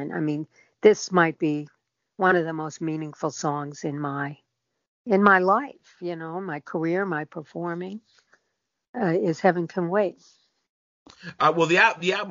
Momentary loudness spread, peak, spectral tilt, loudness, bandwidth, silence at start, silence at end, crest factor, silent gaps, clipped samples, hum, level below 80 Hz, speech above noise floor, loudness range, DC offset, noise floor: 18 LU; -2 dBFS; -4 dB/octave; -24 LUFS; 7.4 kHz; 0 s; 0 s; 22 dB; 4.88-5.05 s, 8.88-8.94 s, 10.69-11.06 s; under 0.1%; none; -72 dBFS; 54 dB; 5 LU; under 0.1%; -78 dBFS